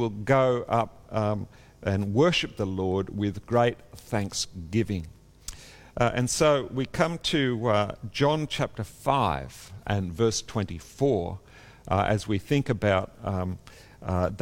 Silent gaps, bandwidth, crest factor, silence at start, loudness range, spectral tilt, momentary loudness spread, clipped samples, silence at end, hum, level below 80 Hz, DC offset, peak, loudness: none; 16.5 kHz; 20 dB; 0 s; 3 LU; -5.5 dB/octave; 14 LU; under 0.1%; 0 s; none; -50 dBFS; under 0.1%; -8 dBFS; -27 LUFS